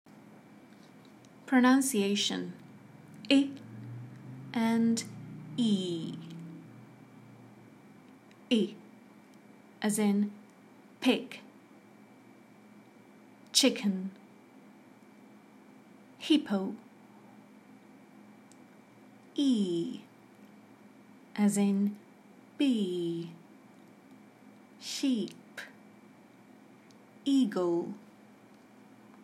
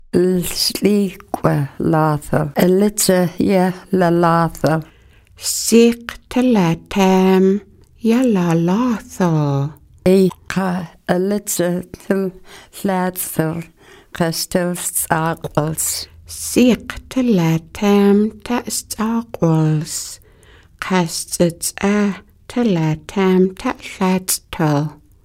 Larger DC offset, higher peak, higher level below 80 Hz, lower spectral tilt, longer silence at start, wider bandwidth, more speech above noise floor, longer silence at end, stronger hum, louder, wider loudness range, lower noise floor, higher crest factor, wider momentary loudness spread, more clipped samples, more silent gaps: neither; second, -10 dBFS vs 0 dBFS; second, -86 dBFS vs -44 dBFS; about the same, -4.5 dB/octave vs -5.5 dB/octave; first, 1.45 s vs 0.15 s; about the same, 15.5 kHz vs 16.5 kHz; about the same, 28 dB vs 30 dB; first, 1.25 s vs 0.3 s; neither; second, -30 LUFS vs -17 LUFS; about the same, 7 LU vs 5 LU; first, -57 dBFS vs -47 dBFS; first, 24 dB vs 18 dB; first, 23 LU vs 9 LU; neither; neither